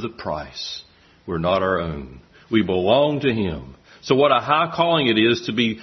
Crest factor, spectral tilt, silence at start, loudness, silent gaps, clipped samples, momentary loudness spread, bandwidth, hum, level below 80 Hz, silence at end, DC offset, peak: 18 dB; -6 dB/octave; 0 s; -20 LUFS; none; under 0.1%; 17 LU; 6.4 kHz; none; -48 dBFS; 0 s; under 0.1%; -2 dBFS